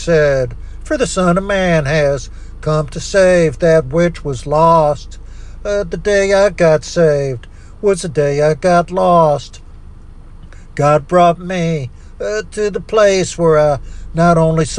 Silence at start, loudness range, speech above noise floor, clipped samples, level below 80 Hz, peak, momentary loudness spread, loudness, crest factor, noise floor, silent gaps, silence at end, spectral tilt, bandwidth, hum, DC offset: 0 s; 2 LU; 21 dB; under 0.1%; -30 dBFS; 0 dBFS; 12 LU; -14 LUFS; 12 dB; -34 dBFS; none; 0 s; -6 dB/octave; 11 kHz; none; under 0.1%